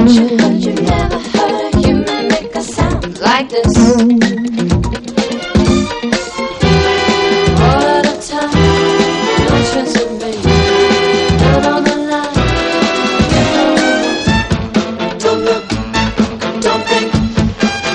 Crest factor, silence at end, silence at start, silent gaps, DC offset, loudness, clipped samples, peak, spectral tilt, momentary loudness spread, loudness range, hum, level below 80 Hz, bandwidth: 12 dB; 0 s; 0 s; none; under 0.1%; -12 LUFS; under 0.1%; 0 dBFS; -5.5 dB/octave; 6 LU; 2 LU; none; -26 dBFS; 10.5 kHz